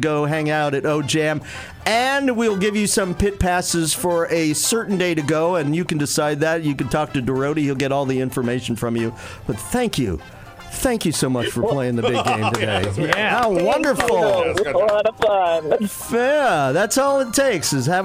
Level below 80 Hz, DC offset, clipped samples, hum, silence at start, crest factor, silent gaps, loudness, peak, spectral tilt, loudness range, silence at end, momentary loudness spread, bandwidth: -42 dBFS; under 0.1%; under 0.1%; none; 0 s; 18 dB; none; -19 LUFS; -2 dBFS; -4.5 dB/octave; 4 LU; 0 s; 6 LU; 16.5 kHz